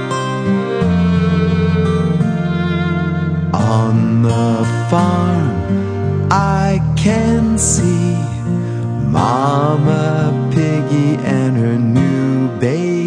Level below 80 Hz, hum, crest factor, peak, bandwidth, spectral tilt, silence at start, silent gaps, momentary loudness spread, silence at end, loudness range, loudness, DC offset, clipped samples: -34 dBFS; none; 14 dB; 0 dBFS; 10 kHz; -6.5 dB/octave; 0 s; none; 4 LU; 0 s; 1 LU; -15 LUFS; under 0.1%; under 0.1%